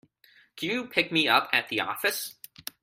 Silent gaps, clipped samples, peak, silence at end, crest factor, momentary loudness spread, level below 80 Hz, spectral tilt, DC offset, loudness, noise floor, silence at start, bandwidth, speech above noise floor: none; under 0.1%; -6 dBFS; 0.5 s; 24 dB; 16 LU; -72 dBFS; -2.5 dB/octave; under 0.1%; -26 LUFS; -61 dBFS; 0.55 s; 16 kHz; 34 dB